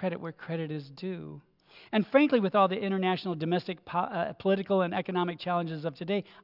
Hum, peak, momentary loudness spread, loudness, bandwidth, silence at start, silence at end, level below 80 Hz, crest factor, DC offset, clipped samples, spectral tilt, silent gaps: none; -10 dBFS; 13 LU; -30 LUFS; 5.8 kHz; 0 s; 0.2 s; -76 dBFS; 20 dB; under 0.1%; under 0.1%; -9 dB/octave; none